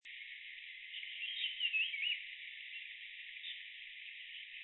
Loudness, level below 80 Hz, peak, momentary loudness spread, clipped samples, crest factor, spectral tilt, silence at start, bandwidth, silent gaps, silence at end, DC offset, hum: -41 LUFS; -88 dBFS; -26 dBFS; 14 LU; under 0.1%; 20 dB; 10.5 dB/octave; 0.05 s; 4.2 kHz; none; 0 s; under 0.1%; none